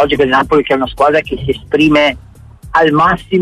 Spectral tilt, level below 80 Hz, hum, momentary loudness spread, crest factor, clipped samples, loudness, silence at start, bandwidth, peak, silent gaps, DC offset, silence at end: -6 dB/octave; -34 dBFS; none; 7 LU; 10 dB; under 0.1%; -12 LUFS; 0 s; 13 kHz; -2 dBFS; none; under 0.1%; 0 s